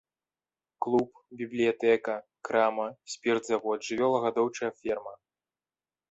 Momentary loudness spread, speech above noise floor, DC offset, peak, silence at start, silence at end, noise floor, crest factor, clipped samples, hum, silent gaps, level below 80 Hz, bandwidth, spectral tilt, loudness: 10 LU; over 61 dB; under 0.1%; -12 dBFS; 0.8 s; 0.95 s; under -90 dBFS; 18 dB; under 0.1%; none; none; -72 dBFS; 8.2 kHz; -4.5 dB/octave; -29 LUFS